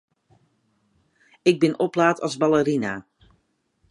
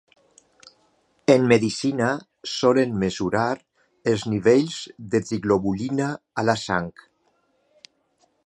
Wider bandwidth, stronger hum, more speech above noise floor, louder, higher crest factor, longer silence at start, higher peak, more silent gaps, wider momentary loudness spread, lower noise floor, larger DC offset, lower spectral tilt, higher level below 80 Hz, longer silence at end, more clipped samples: about the same, 11 kHz vs 11.5 kHz; neither; about the same, 48 dB vs 45 dB; about the same, -21 LUFS vs -23 LUFS; about the same, 20 dB vs 22 dB; first, 1.45 s vs 1.3 s; about the same, -4 dBFS vs -2 dBFS; neither; second, 7 LU vs 10 LU; about the same, -68 dBFS vs -67 dBFS; neither; about the same, -6 dB/octave vs -5.5 dB/octave; second, -62 dBFS vs -56 dBFS; second, 0.9 s vs 1.55 s; neither